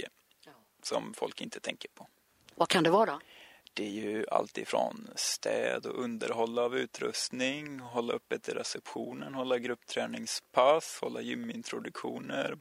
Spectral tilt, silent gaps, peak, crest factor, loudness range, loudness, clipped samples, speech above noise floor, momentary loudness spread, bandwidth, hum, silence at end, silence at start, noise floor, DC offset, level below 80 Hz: -3 dB/octave; none; -10 dBFS; 24 dB; 3 LU; -33 LUFS; under 0.1%; 27 dB; 13 LU; 16 kHz; none; 0 s; 0 s; -60 dBFS; under 0.1%; -80 dBFS